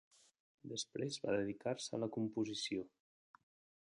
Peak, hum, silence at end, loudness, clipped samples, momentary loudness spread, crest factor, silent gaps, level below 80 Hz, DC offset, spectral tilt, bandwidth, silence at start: -26 dBFS; none; 1.05 s; -42 LUFS; under 0.1%; 8 LU; 18 dB; none; -78 dBFS; under 0.1%; -4.5 dB/octave; 11 kHz; 0.65 s